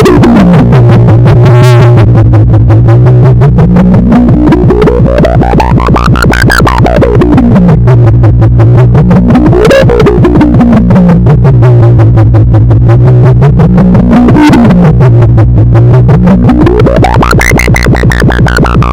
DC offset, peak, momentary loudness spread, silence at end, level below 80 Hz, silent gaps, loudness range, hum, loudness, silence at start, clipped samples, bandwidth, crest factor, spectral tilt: 4%; 0 dBFS; 3 LU; 0 s; -12 dBFS; none; 2 LU; none; -3 LUFS; 0 s; 20%; 12.5 kHz; 2 dB; -8 dB/octave